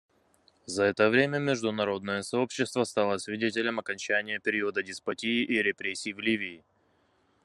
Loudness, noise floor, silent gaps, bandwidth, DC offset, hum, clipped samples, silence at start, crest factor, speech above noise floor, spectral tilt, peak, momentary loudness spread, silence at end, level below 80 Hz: -29 LUFS; -69 dBFS; none; 12 kHz; under 0.1%; none; under 0.1%; 0.7 s; 20 dB; 40 dB; -4 dB/octave; -10 dBFS; 8 LU; 0.85 s; -72 dBFS